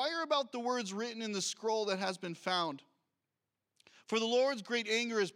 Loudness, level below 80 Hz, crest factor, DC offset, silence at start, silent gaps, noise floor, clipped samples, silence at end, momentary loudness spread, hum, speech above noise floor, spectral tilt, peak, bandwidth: -35 LUFS; under -90 dBFS; 16 dB; under 0.1%; 0 s; none; -89 dBFS; under 0.1%; 0.05 s; 7 LU; none; 54 dB; -3 dB/octave; -20 dBFS; 15.5 kHz